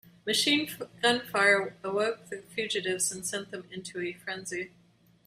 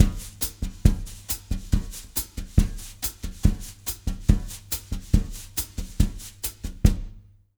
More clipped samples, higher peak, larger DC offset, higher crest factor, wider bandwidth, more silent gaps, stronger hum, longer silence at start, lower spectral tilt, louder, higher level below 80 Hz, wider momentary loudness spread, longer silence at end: neither; second, -10 dBFS vs -2 dBFS; neither; about the same, 20 dB vs 24 dB; second, 15.5 kHz vs over 20 kHz; neither; neither; about the same, 0.05 s vs 0 s; second, -2 dB/octave vs -5 dB/octave; about the same, -29 LUFS vs -28 LUFS; second, -72 dBFS vs -28 dBFS; first, 15 LU vs 8 LU; first, 0.6 s vs 0.4 s